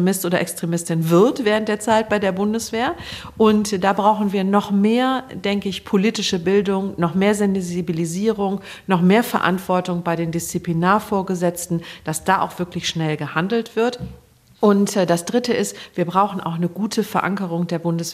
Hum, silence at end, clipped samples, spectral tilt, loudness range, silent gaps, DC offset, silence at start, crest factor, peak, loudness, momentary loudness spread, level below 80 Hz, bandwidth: none; 0 s; under 0.1%; -5.5 dB/octave; 3 LU; none; under 0.1%; 0 s; 16 dB; -2 dBFS; -20 LUFS; 7 LU; -52 dBFS; 15.5 kHz